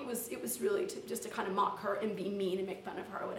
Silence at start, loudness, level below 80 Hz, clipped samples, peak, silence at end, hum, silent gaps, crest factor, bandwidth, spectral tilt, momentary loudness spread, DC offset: 0 s; -37 LUFS; -76 dBFS; under 0.1%; -20 dBFS; 0 s; none; none; 16 dB; 17 kHz; -4 dB/octave; 7 LU; under 0.1%